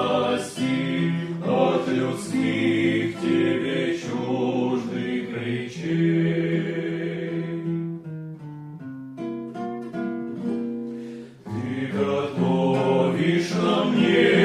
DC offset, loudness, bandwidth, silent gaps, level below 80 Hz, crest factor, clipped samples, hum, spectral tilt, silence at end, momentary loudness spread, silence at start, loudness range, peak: under 0.1%; -24 LUFS; 12 kHz; none; -64 dBFS; 18 dB; under 0.1%; none; -6.5 dB/octave; 0 s; 13 LU; 0 s; 8 LU; -6 dBFS